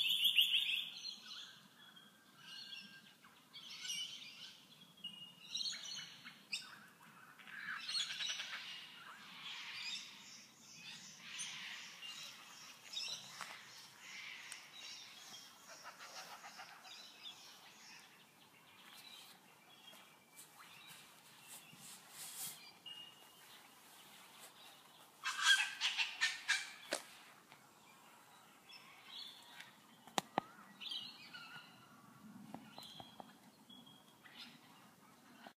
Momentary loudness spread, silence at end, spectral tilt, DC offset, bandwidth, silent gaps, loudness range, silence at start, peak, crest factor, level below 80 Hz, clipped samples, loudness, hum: 22 LU; 0.05 s; 0.5 dB/octave; under 0.1%; 15.5 kHz; none; 19 LU; 0 s; -14 dBFS; 34 dB; under -90 dBFS; under 0.1%; -42 LUFS; none